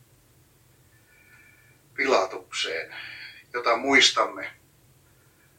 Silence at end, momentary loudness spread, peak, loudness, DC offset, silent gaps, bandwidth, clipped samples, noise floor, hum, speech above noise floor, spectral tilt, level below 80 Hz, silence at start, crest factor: 1.05 s; 21 LU; -6 dBFS; -23 LUFS; under 0.1%; none; 17 kHz; under 0.1%; -59 dBFS; none; 35 dB; -1 dB/octave; -70 dBFS; 2 s; 24 dB